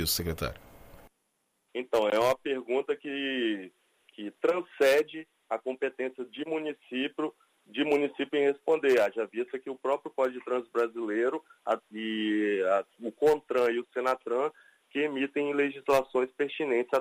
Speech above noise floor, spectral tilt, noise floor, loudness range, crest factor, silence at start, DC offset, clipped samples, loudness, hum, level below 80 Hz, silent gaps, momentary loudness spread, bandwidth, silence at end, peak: 47 dB; -4 dB/octave; -77 dBFS; 2 LU; 18 dB; 0 s; under 0.1%; under 0.1%; -30 LUFS; none; -58 dBFS; none; 11 LU; 15.5 kHz; 0 s; -12 dBFS